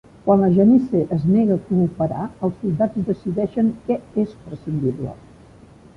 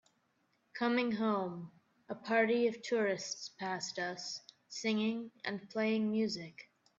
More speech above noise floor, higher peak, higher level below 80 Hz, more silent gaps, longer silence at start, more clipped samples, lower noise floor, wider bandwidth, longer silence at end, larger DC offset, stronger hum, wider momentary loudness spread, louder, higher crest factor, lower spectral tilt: second, 27 dB vs 42 dB; first, -4 dBFS vs -18 dBFS; first, -50 dBFS vs -82 dBFS; neither; second, 0.25 s vs 0.75 s; neither; second, -46 dBFS vs -77 dBFS; second, 5.4 kHz vs 7.8 kHz; first, 0.8 s vs 0.35 s; neither; neither; second, 11 LU vs 15 LU; first, -20 LUFS vs -35 LUFS; about the same, 16 dB vs 18 dB; first, -11 dB/octave vs -4.5 dB/octave